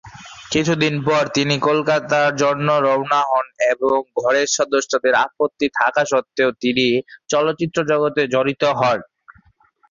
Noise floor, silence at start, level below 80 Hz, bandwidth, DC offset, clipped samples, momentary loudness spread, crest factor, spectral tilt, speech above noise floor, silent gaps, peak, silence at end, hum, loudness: -57 dBFS; 0.05 s; -58 dBFS; 7.6 kHz; under 0.1%; under 0.1%; 4 LU; 16 dB; -4 dB/octave; 39 dB; none; -2 dBFS; 0.6 s; none; -18 LUFS